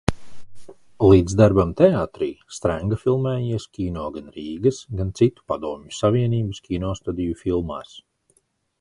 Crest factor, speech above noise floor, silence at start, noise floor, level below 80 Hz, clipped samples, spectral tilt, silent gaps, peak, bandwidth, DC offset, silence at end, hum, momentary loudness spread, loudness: 22 dB; 45 dB; 0.1 s; -66 dBFS; -40 dBFS; under 0.1%; -7.5 dB/octave; none; 0 dBFS; 11.5 kHz; under 0.1%; 0.8 s; none; 13 LU; -22 LUFS